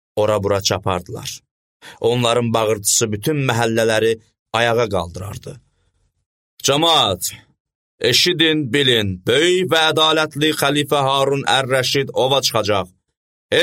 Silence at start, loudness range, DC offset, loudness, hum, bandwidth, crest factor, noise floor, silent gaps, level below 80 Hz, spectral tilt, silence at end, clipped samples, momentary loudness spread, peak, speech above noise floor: 0.15 s; 5 LU; under 0.1%; -17 LUFS; none; 16.5 kHz; 18 dB; -64 dBFS; 1.51-1.80 s, 4.39-4.46 s, 6.26-6.57 s, 7.60-7.65 s, 7.75-7.98 s, 13.17-13.49 s; -52 dBFS; -3.5 dB/octave; 0 s; under 0.1%; 11 LU; 0 dBFS; 47 dB